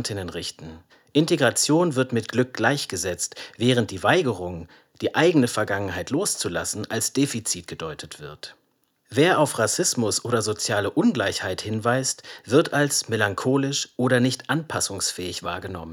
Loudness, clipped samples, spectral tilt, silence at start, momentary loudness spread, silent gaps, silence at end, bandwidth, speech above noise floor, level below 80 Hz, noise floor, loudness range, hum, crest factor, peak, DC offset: -23 LUFS; under 0.1%; -4 dB/octave; 0 s; 13 LU; none; 0 s; 18 kHz; 42 dB; -64 dBFS; -65 dBFS; 3 LU; none; 20 dB; -4 dBFS; under 0.1%